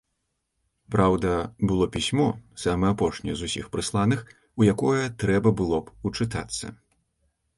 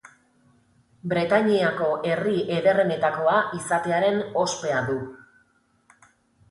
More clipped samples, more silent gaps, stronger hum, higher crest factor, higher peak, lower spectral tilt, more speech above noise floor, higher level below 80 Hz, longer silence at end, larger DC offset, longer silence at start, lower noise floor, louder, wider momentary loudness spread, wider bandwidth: neither; neither; neither; about the same, 20 dB vs 18 dB; about the same, -6 dBFS vs -8 dBFS; about the same, -6 dB/octave vs -5 dB/octave; first, 53 dB vs 42 dB; first, -44 dBFS vs -64 dBFS; second, 0.85 s vs 1.3 s; neither; second, 0.9 s vs 1.05 s; first, -77 dBFS vs -64 dBFS; about the same, -25 LUFS vs -23 LUFS; about the same, 9 LU vs 7 LU; about the same, 11.5 kHz vs 11.5 kHz